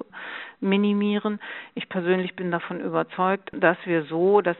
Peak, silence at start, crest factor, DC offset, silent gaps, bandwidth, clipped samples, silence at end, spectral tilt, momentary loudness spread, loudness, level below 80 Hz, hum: -4 dBFS; 0 s; 20 dB; under 0.1%; none; 4.2 kHz; under 0.1%; 0 s; -5 dB/octave; 13 LU; -24 LUFS; -70 dBFS; none